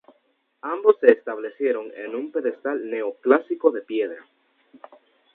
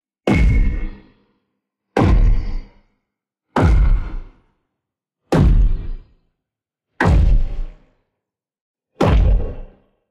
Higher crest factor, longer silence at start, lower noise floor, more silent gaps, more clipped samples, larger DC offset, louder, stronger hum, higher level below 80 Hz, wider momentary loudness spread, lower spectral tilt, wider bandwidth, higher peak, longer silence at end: first, 24 dB vs 14 dB; first, 0.65 s vs 0.25 s; second, -68 dBFS vs -84 dBFS; second, none vs 8.61-8.74 s; neither; neither; second, -23 LUFS vs -18 LUFS; neither; second, -78 dBFS vs -20 dBFS; second, 14 LU vs 20 LU; about the same, -7 dB/octave vs -8 dB/octave; second, 4 kHz vs 8 kHz; about the same, 0 dBFS vs -2 dBFS; first, 1.15 s vs 0.45 s